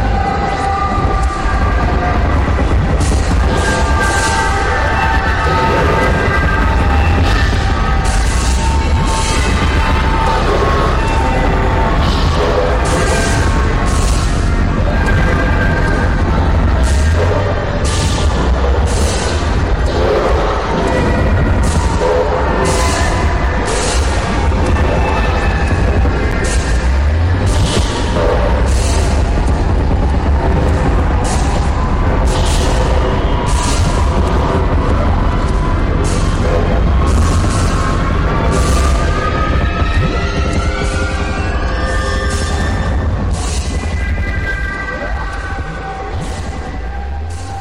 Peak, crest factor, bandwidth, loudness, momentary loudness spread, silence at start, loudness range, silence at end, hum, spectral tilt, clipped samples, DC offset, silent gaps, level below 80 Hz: -2 dBFS; 10 dB; 12.5 kHz; -14 LUFS; 4 LU; 0 s; 3 LU; 0 s; none; -5.5 dB/octave; under 0.1%; under 0.1%; none; -16 dBFS